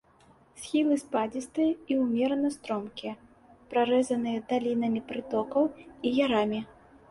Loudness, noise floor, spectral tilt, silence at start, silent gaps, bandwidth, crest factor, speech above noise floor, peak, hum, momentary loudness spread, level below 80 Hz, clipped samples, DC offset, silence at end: -29 LUFS; -60 dBFS; -5 dB/octave; 0.55 s; none; 11.5 kHz; 16 dB; 32 dB; -14 dBFS; none; 11 LU; -66 dBFS; under 0.1%; under 0.1%; 0.45 s